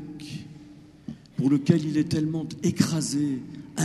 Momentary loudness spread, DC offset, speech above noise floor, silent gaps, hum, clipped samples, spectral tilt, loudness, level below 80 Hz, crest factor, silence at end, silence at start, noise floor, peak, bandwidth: 20 LU; under 0.1%; 24 dB; none; none; under 0.1%; -6 dB/octave; -26 LUFS; -60 dBFS; 22 dB; 0 s; 0 s; -48 dBFS; -4 dBFS; 13 kHz